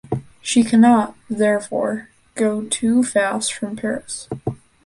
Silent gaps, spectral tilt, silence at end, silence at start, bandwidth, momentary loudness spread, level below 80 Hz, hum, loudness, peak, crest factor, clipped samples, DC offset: none; -4.5 dB/octave; 0.3 s; 0.1 s; 11.5 kHz; 15 LU; -54 dBFS; none; -19 LUFS; -2 dBFS; 16 dB; under 0.1%; under 0.1%